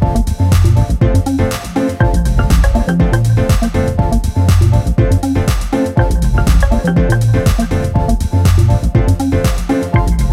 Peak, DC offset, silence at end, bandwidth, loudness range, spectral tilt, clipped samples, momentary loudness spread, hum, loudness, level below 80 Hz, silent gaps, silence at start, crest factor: 0 dBFS; under 0.1%; 0 s; 16 kHz; 1 LU; -7 dB/octave; under 0.1%; 4 LU; none; -13 LUFS; -16 dBFS; none; 0 s; 10 dB